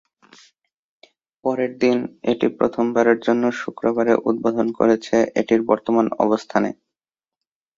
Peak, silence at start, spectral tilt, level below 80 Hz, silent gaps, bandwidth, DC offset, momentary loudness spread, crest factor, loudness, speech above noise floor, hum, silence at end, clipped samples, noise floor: -2 dBFS; 1.45 s; -6 dB/octave; -62 dBFS; none; 7.6 kHz; under 0.1%; 6 LU; 18 dB; -20 LUFS; over 71 dB; none; 1.05 s; under 0.1%; under -90 dBFS